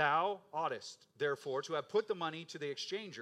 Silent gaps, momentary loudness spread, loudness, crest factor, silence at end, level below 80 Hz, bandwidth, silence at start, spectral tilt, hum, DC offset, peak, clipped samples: none; 8 LU; -38 LUFS; 20 dB; 0 s; under -90 dBFS; 12.5 kHz; 0 s; -4 dB/octave; none; under 0.1%; -18 dBFS; under 0.1%